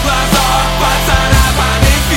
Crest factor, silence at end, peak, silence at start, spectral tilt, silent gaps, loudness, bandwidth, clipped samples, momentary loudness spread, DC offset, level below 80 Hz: 10 dB; 0 s; 0 dBFS; 0 s; -3.5 dB/octave; none; -11 LUFS; 17 kHz; under 0.1%; 2 LU; under 0.1%; -16 dBFS